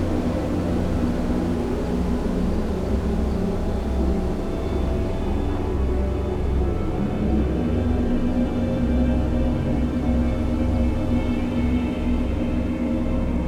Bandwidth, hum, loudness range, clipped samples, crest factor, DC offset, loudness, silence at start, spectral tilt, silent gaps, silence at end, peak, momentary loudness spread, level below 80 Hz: 10.5 kHz; none; 2 LU; under 0.1%; 14 dB; under 0.1%; -24 LUFS; 0 s; -8.5 dB/octave; none; 0 s; -8 dBFS; 3 LU; -26 dBFS